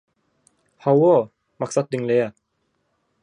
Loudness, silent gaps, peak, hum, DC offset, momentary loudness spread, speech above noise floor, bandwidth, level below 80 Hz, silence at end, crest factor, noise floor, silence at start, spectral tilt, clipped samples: -20 LUFS; none; -6 dBFS; none; under 0.1%; 14 LU; 53 dB; 10.5 kHz; -70 dBFS; 0.95 s; 18 dB; -71 dBFS; 0.85 s; -7 dB/octave; under 0.1%